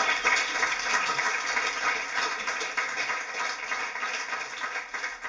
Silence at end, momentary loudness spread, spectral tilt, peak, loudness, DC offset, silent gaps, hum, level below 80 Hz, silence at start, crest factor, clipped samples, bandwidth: 0 s; 8 LU; 0.5 dB/octave; -10 dBFS; -27 LUFS; under 0.1%; none; none; -64 dBFS; 0 s; 20 dB; under 0.1%; 8 kHz